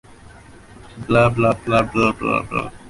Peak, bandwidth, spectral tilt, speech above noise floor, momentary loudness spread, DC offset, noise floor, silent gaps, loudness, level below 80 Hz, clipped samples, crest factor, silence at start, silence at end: -4 dBFS; 11.5 kHz; -7 dB/octave; 25 dB; 7 LU; under 0.1%; -43 dBFS; none; -18 LUFS; -42 dBFS; under 0.1%; 16 dB; 0.35 s; 0 s